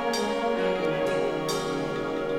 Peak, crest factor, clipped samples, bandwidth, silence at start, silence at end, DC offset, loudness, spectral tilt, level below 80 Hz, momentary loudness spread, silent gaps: -14 dBFS; 12 dB; under 0.1%; 17 kHz; 0 s; 0 s; under 0.1%; -27 LUFS; -4.5 dB/octave; -52 dBFS; 3 LU; none